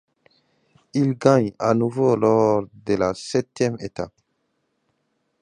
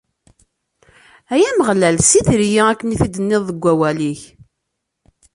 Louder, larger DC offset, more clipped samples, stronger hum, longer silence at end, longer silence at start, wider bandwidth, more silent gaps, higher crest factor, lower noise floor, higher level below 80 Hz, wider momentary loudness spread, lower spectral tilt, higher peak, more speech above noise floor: second, -21 LUFS vs -15 LUFS; neither; neither; neither; first, 1.35 s vs 1.1 s; second, 0.95 s vs 1.3 s; about the same, 11 kHz vs 11.5 kHz; neither; about the same, 22 dB vs 18 dB; second, -72 dBFS vs -76 dBFS; second, -56 dBFS vs -40 dBFS; first, 12 LU vs 9 LU; first, -7 dB/octave vs -4.5 dB/octave; about the same, -2 dBFS vs 0 dBFS; second, 52 dB vs 61 dB